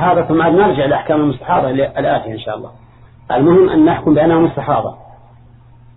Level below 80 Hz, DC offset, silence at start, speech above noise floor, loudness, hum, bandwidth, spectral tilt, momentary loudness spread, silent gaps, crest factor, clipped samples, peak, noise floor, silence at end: -42 dBFS; under 0.1%; 0 s; 29 dB; -13 LUFS; none; 4.1 kHz; -11.5 dB/octave; 12 LU; none; 12 dB; under 0.1%; -2 dBFS; -42 dBFS; 1 s